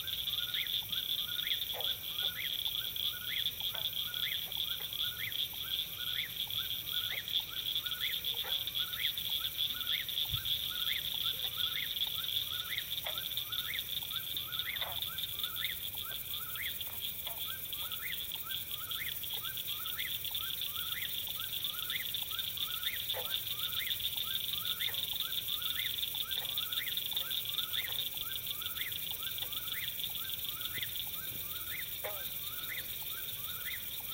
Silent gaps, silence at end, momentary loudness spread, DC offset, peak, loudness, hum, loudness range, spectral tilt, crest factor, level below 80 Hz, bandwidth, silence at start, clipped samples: none; 0 s; 4 LU; under 0.1%; -20 dBFS; -35 LUFS; none; 3 LU; 0 dB/octave; 18 dB; -64 dBFS; 17 kHz; 0 s; under 0.1%